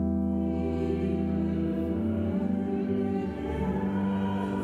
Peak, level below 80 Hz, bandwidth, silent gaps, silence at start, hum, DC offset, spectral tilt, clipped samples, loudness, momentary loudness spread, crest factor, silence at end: -18 dBFS; -44 dBFS; 4.7 kHz; none; 0 s; none; under 0.1%; -9.5 dB/octave; under 0.1%; -29 LUFS; 2 LU; 10 dB; 0 s